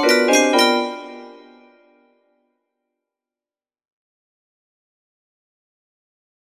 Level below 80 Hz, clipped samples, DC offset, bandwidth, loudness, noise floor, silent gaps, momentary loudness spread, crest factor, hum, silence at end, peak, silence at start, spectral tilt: -76 dBFS; under 0.1%; under 0.1%; 15.5 kHz; -16 LUFS; under -90 dBFS; none; 23 LU; 22 dB; none; 5.2 s; -2 dBFS; 0 s; -0.5 dB/octave